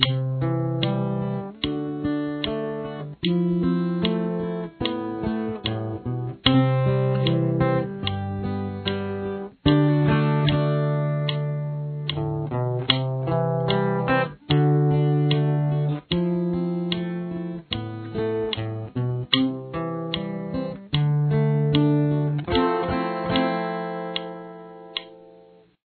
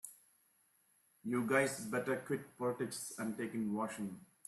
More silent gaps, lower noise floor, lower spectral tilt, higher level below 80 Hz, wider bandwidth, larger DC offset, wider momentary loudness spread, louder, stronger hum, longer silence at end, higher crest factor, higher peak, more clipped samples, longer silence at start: neither; second, -52 dBFS vs -74 dBFS; first, -10.5 dB/octave vs -5 dB/octave; first, -48 dBFS vs -80 dBFS; second, 4.5 kHz vs 14 kHz; neither; about the same, 10 LU vs 11 LU; first, -24 LUFS vs -39 LUFS; neither; first, 0.5 s vs 0.25 s; about the same, 24 dB vs 22 dB; first, 0 dBFS vs -18 dBFS; neither; about the same, 0 s vs 0.05 s